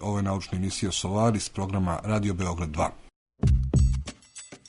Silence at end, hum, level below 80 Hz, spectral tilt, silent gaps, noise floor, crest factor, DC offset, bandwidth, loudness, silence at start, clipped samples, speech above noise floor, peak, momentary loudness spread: 0.15 s; none; -32 dBFS; -5.5 dB/octave; 3.16-3.26 s; -47 dBFS; 14 dB; under 0.1%; 11 kHz; -27 LUFS; 0 s; under 0.1%; 20 dB; -12 dBFS; 7 LU